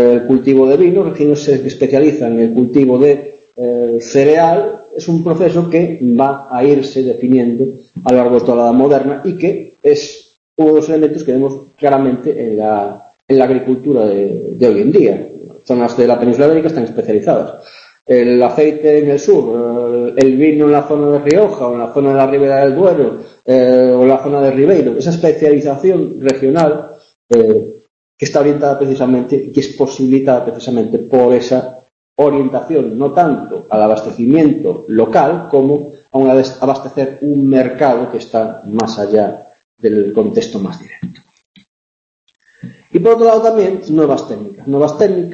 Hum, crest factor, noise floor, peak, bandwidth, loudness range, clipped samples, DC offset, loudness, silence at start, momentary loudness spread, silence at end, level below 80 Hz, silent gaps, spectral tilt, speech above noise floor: none; 12 dB; -34 dBFS; 0 dBFS; 8 kHz; 4 LU; under 0.1%; under 0.1%; -12 LUFS; 0 s; 9 LU; 0 s; -54 dBFS; 10.37-10.56 s, 13.22-13.28 s, 27.15-27.29 s, 27.90-28.18 s, 31.92-32.16 s, 39.64-39.78 s, 41.45-41.54 s, 41.68-42.27 s; -7.5 dB/octave; 23 dB